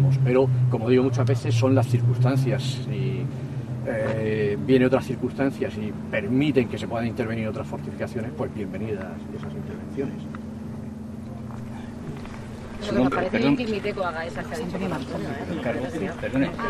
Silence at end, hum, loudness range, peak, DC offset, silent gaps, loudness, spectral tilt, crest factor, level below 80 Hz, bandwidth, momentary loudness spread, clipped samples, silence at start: 0 s; none; 10 LU; -6 dBFS; under 0.1%; none; -25 LUFS; -7.5 dB/octave; 18 dB; -52 dBFS; 12.5 kHz; 15 LU; under 0.1%; 0 s